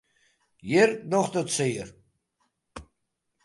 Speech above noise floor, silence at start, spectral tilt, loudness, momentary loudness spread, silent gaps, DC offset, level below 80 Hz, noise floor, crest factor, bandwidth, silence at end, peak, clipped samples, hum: 54 dB; 0.65 s; -4.5 dB/octave; -25 LUFS; 25 LU; none; under 0.1%; -60 dBFS; -79 dBFS; 22 dB; 11.5 kHz; 0.65 s; -8 dBFS; under 0.1%; none